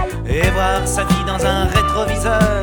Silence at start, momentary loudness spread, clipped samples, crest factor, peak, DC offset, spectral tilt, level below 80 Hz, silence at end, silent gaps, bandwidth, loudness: 0 s; 2 LU; under 0.1%; 16 dB; 0 dBFS; under 0.1%; -5 dB/octave; -24 dBFS; 0 s; none; 19.5 kHz; -17 LUFS